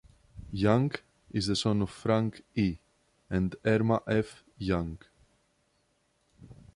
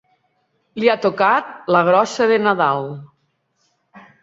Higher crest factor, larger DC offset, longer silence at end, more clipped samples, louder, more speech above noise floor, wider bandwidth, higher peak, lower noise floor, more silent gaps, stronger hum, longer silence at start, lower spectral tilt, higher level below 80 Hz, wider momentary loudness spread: about the same, 20 dB vs 18 dB; neither; about the same, 0.25 s vs 0.25 s; neither; second, -30 LUFS vs -17 LUFS; second, 44 dB vs 50 dB; first, 11.5 kHz vs 7.8 kHz; second, -10 dBFS vs -2 dBFS; first, -72 dBFS vs -67 dBFS; neither; neither; second, 0.35 s vs 0.75 s; about the same, -6.5 dB/octave vs -5.5 dB/octave; first, -50 dBFS vs -66 dBFS; about the same, 14 LU vs 13 LU